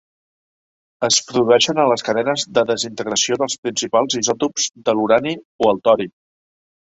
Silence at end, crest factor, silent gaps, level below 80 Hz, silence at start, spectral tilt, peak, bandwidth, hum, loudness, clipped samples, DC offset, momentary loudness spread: 0.75 s; 18 dB; 3.58-3.63 s, 5.45-5.59 s; -60 dBFS; 1 s; -2.5 dB/octave; -2 dBFS; 8.2 kHz; none; -18 LUFS; under 0.1%; under 0.1%; 6 LU